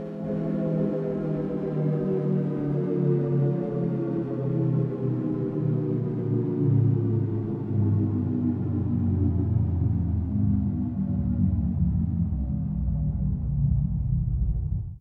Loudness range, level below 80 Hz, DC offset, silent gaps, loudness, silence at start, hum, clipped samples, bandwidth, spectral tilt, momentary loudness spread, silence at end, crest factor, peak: 1 LU; -36 dBFS; under 0.1%; none; -26 LUFS; 0 s; none; under 0.1%; 3.4 kHz; -12.5 dB/octave; 4 LU; 0 s; 14 dB; -12 dBFS